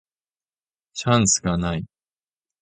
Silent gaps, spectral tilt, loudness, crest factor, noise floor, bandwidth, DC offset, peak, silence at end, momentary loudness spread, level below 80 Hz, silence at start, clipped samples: none; -4 dB/octave; -21 LUFS; 22 dB; under -90 dBFS; 9.6 kHz; under 0.1%; -4 dBFS; 0.75 s; 18 LU; -44 dBFS; 0.95 s; under 0.1%